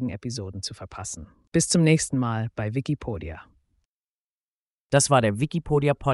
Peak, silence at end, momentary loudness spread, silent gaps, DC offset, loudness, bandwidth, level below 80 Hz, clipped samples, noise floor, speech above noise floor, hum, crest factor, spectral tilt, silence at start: -6 dBFS; 0 s; 16 LU; 3.85-4.90 s; under 0.1%; -24 LUFS; 11.5 kHz; -50 dBFS; under 0.1%; under -90 dBFS; over 66 dB; none; 20 dB; -5 dB/octave; 0 s